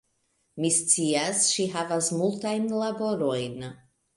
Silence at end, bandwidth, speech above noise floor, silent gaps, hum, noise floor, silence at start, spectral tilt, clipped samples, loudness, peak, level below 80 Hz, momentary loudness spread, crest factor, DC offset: 0.4 s; 11.5 kHz; 46 dB; none; none; -72 dBFS; 0.55 s; -3 dB/octave; under 0.1%; -25 LUFS; -8 dBFS; -68 dBFS; 12 LU; 20 dB; under 0.1%